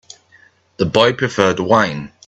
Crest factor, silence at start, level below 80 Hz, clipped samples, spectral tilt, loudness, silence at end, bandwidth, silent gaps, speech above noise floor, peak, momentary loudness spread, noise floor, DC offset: 18 dB; 0.8 s; -50 dBFS; under 0.1%; -5 dB/octave; -15 LUFS; 0.2 s; 8.4 kHz; none; 36 dB; 0 dBFS; 6 LU; -51 dBFS; under 0.1%